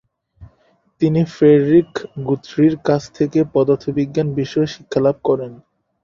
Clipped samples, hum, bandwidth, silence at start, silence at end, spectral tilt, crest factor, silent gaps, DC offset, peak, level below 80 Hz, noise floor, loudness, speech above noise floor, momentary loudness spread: under 0.1%; none; 7.4 kHz; 0.4 s; 0.5 s; -8 dB/octave; 16 dB; none; under 0.1%; -2 dBFS; -52 dBFS; -59 dBFS; -17 LUFS; 43 dB; 10 LU